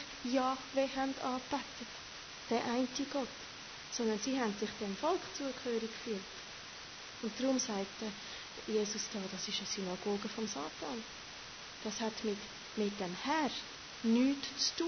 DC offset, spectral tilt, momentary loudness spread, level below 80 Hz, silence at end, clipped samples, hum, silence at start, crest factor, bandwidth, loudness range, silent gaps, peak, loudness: under 0.1%; -3 dB/octave; 12 LU; -68 dBFS; 0 s; under 0.1%; none; 0 s; 18 dB; 6.6 kHz; 3 LU; none; -20 dBFS; -38 LUFS